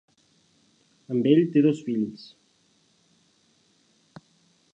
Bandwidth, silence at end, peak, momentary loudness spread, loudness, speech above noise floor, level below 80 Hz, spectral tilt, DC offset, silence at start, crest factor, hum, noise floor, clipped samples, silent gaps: 8 kHz; 2.6 s; -6 dBFS; 13 LU; -23 LUFS; 43 dB; -76 dBFS; -8 dB/octave; under 0.1%; 1.1 s; 22 dB; none; -65 dBFS; under 0.1%; none